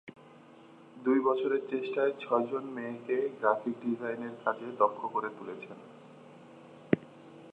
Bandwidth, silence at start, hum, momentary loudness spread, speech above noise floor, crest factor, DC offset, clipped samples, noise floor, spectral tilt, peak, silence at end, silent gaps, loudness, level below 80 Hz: 7.8 kHz; 0.05 s; none; 24 LU; 23 dB; 26 dB; under 0.1%; under 0.1%; -55 dBFS; -8 dB/octave; -8 dBFS; 0 s; none; -32 LUFS; -76 dBFS